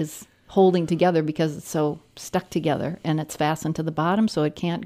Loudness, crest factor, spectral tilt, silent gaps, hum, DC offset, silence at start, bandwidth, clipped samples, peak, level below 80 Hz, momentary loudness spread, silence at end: -24 LUFS; 16 dB; -6.5 dB/octave; none; none; under 0.1%; 0 s; 15.5 kHz; under 0.1%; -6 dBFS; -58 dBFS; 9 LU; 0 s